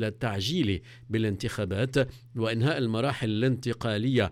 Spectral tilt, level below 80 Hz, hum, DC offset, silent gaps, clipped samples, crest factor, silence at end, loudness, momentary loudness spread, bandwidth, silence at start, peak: -6.5 dB/octave; -54 dBFS; none; under 0.1%; none; under 0.1%; 14 dB; 0 s; -28 LUFS; 5 LU; 14.5 kHz; 0 s; -14 dBFS